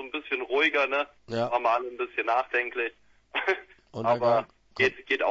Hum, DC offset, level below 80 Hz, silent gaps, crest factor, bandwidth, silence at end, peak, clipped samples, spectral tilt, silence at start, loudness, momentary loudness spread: none; under 0.1%; -66 dBFS; none; 18 dB; 7.8 kHz; 0 s; -10 dBFS; under 0.1%; -5 dB/octave; 0 s; -27 LUFS; 9 LU